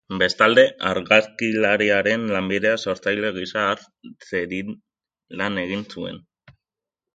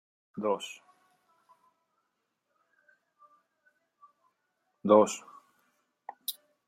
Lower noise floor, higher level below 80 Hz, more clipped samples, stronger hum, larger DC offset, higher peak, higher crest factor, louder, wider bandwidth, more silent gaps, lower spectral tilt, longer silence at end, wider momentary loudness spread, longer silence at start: first, -88 dBFS vs -81 dBFS; first, -56 dBFS vs -86 dBFS; neither; neither; neither; first, 0 dBFS vs -8 dBFS; about the same, 22 dB vs 26 dB; first, -20 LUFS vs -29 LUFS; second, 9 kHz vs 16 kHz; neither; about the same, -4.5 dB/octave vs -4.5 dB/octave; first, 0.95 s vs 0.35 s; second, 16 LU vs 27 LU; second, 0.1 s vs 0.35 s